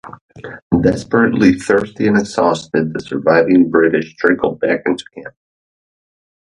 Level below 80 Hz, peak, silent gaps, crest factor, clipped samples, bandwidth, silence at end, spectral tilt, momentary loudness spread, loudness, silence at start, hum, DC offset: -46 dBFS; 0 dBFS; 0.21-0.29 s, 0.62-0.70 s; 16 dB; under 0.1%; 11 kHz; 1.3 s; -6.5 dB/octave; 12 LU; -15 LUFS; 0.05 s; none; under 0.1%